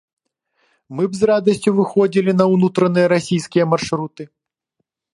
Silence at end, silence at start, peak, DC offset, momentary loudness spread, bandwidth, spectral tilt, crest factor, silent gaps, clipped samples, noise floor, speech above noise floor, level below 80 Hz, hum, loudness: 0.9 s; 0.9 s; 0 dBFS; under 0.1%; 9 LU; 11.5 kHz; -6.5 dB/octave; 18 dB; none; under 0.1%; -75 dBFS; 59 dB; -58 dBFS; none; -17 LUFS